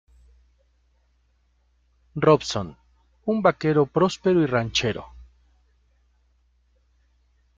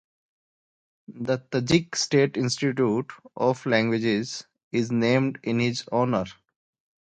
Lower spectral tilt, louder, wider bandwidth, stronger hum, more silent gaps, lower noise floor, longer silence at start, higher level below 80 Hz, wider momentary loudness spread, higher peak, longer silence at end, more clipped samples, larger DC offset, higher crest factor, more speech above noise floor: about the same, -5.5 dB/octave vs -5 dB/octave; first, -22 LUFS vs -25 LUFS; second, 7.8 kHz vs 9.4 kHz; neither; second, none vs 4.64-4.71 s; second, -65 dBFS vs under -90 dBFS; first, 2.15 s vs 1.1 s; first, -54 dBFS vs -60 dBFS; first, 14 LU vs 8 LU; about the same, -4 dBFS vs -6 dBFS; first, 2.35 s vs 0.7 s; neither; neither; about the same, 22 dB vs 20 dB; second, 44 dB vs over 66 dB